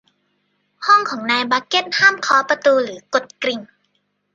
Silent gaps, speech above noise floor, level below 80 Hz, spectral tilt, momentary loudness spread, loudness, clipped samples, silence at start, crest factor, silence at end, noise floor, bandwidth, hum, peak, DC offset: none; 51 dB; -70 dBFS; -2 dB/octave; 10 LU; -17 LUFS; under 0.1%; 0.8 s; 18 dB; 0.7 s; -68 dBFS; 9 kHz; 50 Hz at -50 dBFS; -2 dBFS; under 0.1%